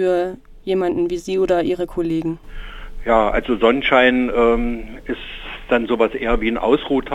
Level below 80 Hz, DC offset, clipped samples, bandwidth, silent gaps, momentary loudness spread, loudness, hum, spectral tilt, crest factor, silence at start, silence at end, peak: -32 dBFS; under 0.1%; under 0.1%; 11.5 kHz; none; 15 LU; -18 LUFS; none; -6 dB/octave; 18 dB; 0 s; 0 s; -2 dBFS